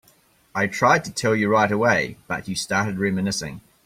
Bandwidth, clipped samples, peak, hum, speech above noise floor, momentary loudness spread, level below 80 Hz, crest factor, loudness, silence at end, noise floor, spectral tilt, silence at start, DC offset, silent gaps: 16 kHz; under 0.1%; -4 dBFS; none; 37 dB; 10 LU; -56 dBFS; 18 dB; -22 LUFS; 0.25 s; -58 dBFS; -4.5 dB/octave; 0.55 s; under 0.1%; none